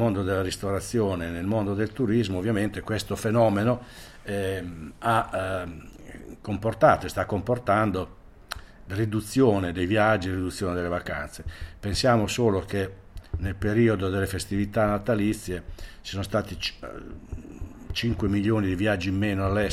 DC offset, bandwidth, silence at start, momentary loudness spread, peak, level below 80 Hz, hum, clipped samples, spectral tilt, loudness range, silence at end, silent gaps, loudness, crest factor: under 0.1%; 15.5 kHz; 0 s; 18 LU; -6 dBFS; -44 dBFS; none; under 0.1%; -6 dB/octave; 4 LU; 0 s; none; -26 LUFS; 20 dB